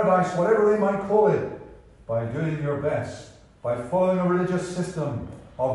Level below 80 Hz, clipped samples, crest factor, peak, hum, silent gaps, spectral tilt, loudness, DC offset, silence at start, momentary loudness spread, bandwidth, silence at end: -54 dBFS; under 0.1%; 16 dB; -8 dBFS; none; none; -7.5 dB/octave; -24 LUFS; under 0.1%; 0 s; 14 LU; 11.5 kHz; 0 s